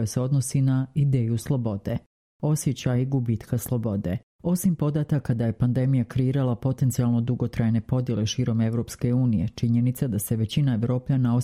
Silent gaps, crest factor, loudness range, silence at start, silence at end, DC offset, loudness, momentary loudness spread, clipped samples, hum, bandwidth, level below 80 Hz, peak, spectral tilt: 2.06-2.40 s, 4.23-4.39 s; 12 dB; 2 LU; 0 s; 0 s; under 0.1%; -25 LUFS; 4 LU; under 0.1%; none; 15.5 kHz; -50 dBFS; -10 dBFS; -7 dB/octave